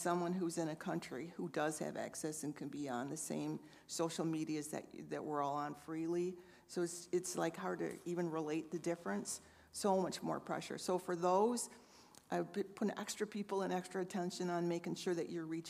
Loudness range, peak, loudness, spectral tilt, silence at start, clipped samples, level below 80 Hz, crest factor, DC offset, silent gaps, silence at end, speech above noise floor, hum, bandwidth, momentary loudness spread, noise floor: 3 LU; -22 dBFS; -41 LUFS; -5 dB/octave; 0 s; under 0.1%; -82 dBFS; 18 dB; under 0.1%; none; 0 s; 22 dB; none; 15.5 kHz; 8 LU; -63 dBFS